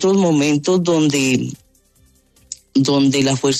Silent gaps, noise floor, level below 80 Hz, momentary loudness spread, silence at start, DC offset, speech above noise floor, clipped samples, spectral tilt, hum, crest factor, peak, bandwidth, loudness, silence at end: none; -55 dBFS; -56 dBFS; 11 LU; 0 s; under 0.1%; 40 dB; under 0.1%; -5 dB/octave; none; 12 dB; -4 dBFS; 13.5 kHz; -16 LUFS; 0 s